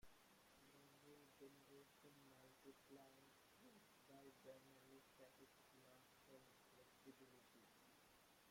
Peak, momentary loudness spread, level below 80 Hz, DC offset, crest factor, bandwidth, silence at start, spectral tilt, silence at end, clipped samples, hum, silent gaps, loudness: -50 dBFS; 4 LU; -90 dBFS; under 0.1%; 18 dB; 16.5 kHz; 0 s; -3.5 dB/octave; 0 s; under 0.1%; none; none; -68 LUFS